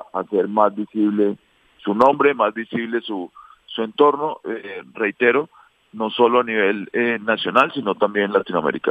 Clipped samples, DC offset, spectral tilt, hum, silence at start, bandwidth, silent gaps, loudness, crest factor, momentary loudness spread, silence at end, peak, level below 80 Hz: under 0.1%; under 0.1%; -7 dB/octave; none; 0 s; 8 kHz; none; -19 LUFS; 20 dB; 13 LU; 0 s; 0 dBFS; -68 dBFS